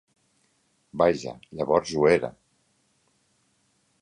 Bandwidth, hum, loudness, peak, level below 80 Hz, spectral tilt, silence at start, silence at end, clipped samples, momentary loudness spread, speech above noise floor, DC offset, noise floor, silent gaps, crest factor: 10.5 kHz; none; -24 LUFS; -6 dBFS; -58 dBFS; -5.5 dB/octave; 0.95 s; 1.7 s; under 0.1%; 16 LU; 45 dB; under 0.1%; -69 dBFS; none; 22 dB